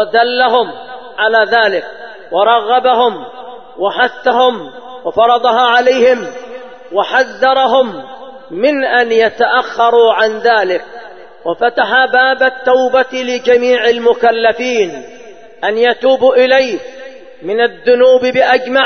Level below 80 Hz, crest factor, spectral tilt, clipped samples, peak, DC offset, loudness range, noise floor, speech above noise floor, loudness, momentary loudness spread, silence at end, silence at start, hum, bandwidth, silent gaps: -56 dBFS; 12 dB; -3 dB/octave; under 0.1%; 0 dBFS; 0.7%; 2 LU; -35 dBFS; 25 dB; -11 LUFS; 19 LU; 0 s; 0 s; none; 6.6 kHz; none